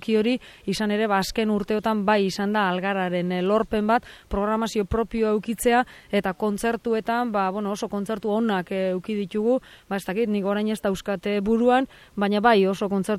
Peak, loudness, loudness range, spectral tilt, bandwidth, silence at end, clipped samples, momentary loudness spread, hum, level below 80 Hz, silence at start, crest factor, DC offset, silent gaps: -6 dBFS; -24 LUFS; 3 LU; -5.5 dB/octave; 15 kHz; 0 s; under 0.1%; 7 LU; none; -48 dBFS; 0 s; 18 dB; under 0.1%; none